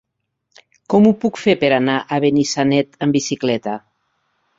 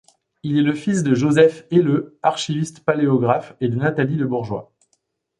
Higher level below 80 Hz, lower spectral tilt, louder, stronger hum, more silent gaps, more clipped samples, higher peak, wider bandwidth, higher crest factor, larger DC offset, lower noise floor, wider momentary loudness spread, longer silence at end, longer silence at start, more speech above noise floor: about the same, -56 dBFS vs -58 dBFS; about the same, -5.5 dB/octave vs -6.5 dB/octave; about the same, -17 LUFS vs -19 LUFS; neither; neither; neither; about the same, -2 dBFS vs -2 dBFS; second, 7.8 kHz vs 11.5 kHz; about the same, 16 dB vs 18 dB; neither; first, -73 dBFS vs -69 dBFS; about the same, 7 LU vs 9 LU; about the same, 0.8 s vs 0.75 s; first, 0.9 s vs 0.45 s; first, 57 dB vs 51 dB